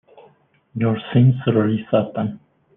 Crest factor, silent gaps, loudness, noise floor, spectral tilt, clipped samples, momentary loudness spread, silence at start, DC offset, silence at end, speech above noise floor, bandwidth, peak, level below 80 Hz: 16 dB; none; -19 LUFS; -56 dBFS; -11.5 dB/octave; under 0.1%; 11 LU; 0.75 s; under 0.1%; 0.4 s; 38 dB; 3.8 kHz; -4 dBFS; -58 dBFS